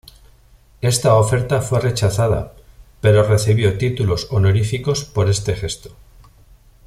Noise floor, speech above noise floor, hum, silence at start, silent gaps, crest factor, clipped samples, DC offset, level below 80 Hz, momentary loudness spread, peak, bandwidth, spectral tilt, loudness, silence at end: -49 dBFS; 33 dB; none; 0.8 s; none; 18 dB; under 0.1%; under 0.1%; -40 dBFS; 9 LU; 0 dBFS; 14.5 kHz; -5.5 dB/octave; -17 LUFS; 0.95 s